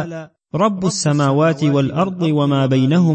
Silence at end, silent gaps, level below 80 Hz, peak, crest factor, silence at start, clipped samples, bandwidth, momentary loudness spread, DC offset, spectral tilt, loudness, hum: 0 s; none; -56 dBFS; -4 dBFS; 12 dB; 0 s; under 0.1%; 8.8 kHz; 7 LU; under 0.1%; -6.5 dB/octave; -16 LUFS; none